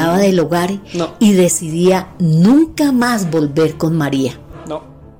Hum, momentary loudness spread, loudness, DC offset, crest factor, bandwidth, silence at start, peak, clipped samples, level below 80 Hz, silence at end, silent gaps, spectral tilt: none; 13 LU; -14 LUFS; 0.4%; 12 dB; 16.5 kHz; 0 s; -2 dBFS; under 0.1%; -44 dBFS; 0.3 s; none; -6 dB/octave